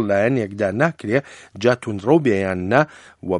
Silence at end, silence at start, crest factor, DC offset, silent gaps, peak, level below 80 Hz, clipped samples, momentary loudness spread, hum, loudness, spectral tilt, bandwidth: 0 s; 0 s; 20 dB; under 0.1%; none; 0 dBFS; -58 dBFS; under 0.1%; 6 LU; none; -20 LUFS; -7 dB/octave; 11 kHz